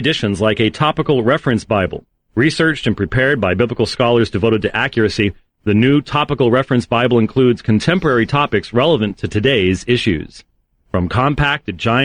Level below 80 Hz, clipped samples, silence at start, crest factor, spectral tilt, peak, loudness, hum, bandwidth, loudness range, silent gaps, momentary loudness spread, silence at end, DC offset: -38 dBFS; under 0.1%; 0 s; 12 dB; -6.5 dB/octave; -2 dBFS; -15 LUFS; none; 10 kHz; 2 LU; none; 5 LU; 0 s; under 0.1%